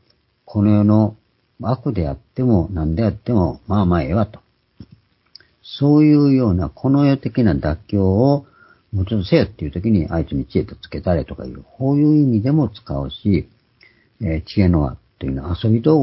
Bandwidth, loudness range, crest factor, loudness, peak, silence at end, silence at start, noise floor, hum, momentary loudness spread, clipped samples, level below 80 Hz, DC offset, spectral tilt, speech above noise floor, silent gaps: 5.8 kHz; 5 LU; 16 dB; -18 LUFS; 0 dBFS; 0 s; 0.5 s; -54 dBFS; none; 12 LU; under 0.1%; -32 dBFS; under 0.1%; -13 dB/octave; 37 dB; none